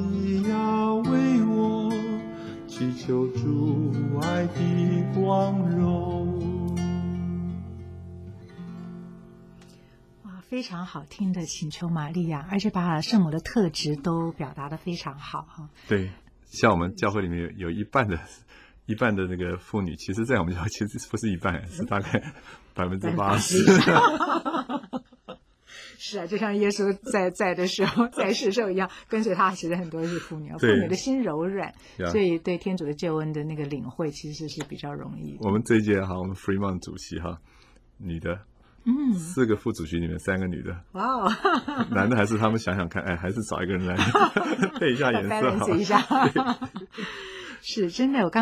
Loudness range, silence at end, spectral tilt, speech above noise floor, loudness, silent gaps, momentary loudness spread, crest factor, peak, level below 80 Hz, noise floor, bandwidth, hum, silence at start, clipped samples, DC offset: 8 LU; 0 s; -6 dB/octave; 28 dB; -26 LUFS; none; 15 LU; 22 dB; -4 dBFS; -48 dBFS; -53 dBFS; 15 kHz; none; 0 s; under 0.1%; under 0.1%